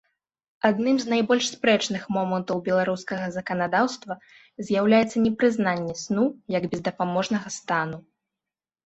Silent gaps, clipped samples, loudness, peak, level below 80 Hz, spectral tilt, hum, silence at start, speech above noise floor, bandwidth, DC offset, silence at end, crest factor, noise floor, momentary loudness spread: none; under 0.1%; -24 LUFS; -6 dBFS; -62 dBFS; -5 dB/octave; none; 0.65 s; 66 dB; 8.2 kHz; under 0.1%; 0.85 s; 20 dB; -90 dBFS; 8 LU